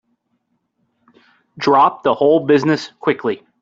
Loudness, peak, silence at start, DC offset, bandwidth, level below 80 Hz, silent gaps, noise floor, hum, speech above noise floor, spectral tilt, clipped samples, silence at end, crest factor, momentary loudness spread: -16 LUFS; -2 dBFS; 1.55 s; under 0.1%; 7.6 kHz; -62 dBFS; none; -68 dBFS; none; 53 dB; -6.5 dB/octave; under 0.1%; 0.25 s; 16 dB; 9 LU